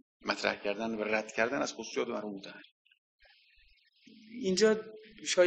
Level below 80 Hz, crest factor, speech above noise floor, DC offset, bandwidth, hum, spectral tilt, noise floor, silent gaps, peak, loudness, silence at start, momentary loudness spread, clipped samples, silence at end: -72 dBFS; 22 dB; 34 dB; under 0.1%; 8.2 kHz; none; -3.5 dB/octave; -65 dBFS; 2.71-2.85 s, 2.98-3.19 s; -12 dBFS; -33 LUFS; 0.25 s; 19 LU; under 0.1%; 0 s